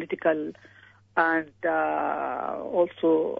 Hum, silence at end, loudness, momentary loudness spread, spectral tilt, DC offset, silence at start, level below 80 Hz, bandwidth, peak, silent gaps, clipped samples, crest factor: none; 0 s; -26 LUFS; 7 LU; -8 dB/octave; under 0.1%; 0 s; -72 dBFS; 5 kHz; -6 dBFS; none; under 0.1%; 20 dB